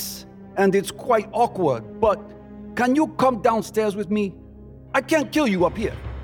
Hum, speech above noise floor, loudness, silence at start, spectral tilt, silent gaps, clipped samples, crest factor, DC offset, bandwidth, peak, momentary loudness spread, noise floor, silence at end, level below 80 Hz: none; 21 dB; -22 LUFS; 0 s; -5.5 dB/octave; none; under 0.1%; 18 dB; under 0.1%; 19.5 kHz; -6 dBFS; 11 LU; -42 dBFS; 0 s; -44 dBFS